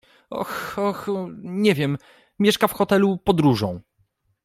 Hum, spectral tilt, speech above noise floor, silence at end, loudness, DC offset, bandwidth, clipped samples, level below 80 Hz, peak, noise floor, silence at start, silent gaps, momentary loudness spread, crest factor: none; -6 dB/octave; 46 dB; 0.65 s; -22 LUFS; under 0.1%; 16 kHz; under 0.1%; -52 dBFS; -2 dBFS; -67 dBFS; 0.3 s; none; 12 LU; 20 dB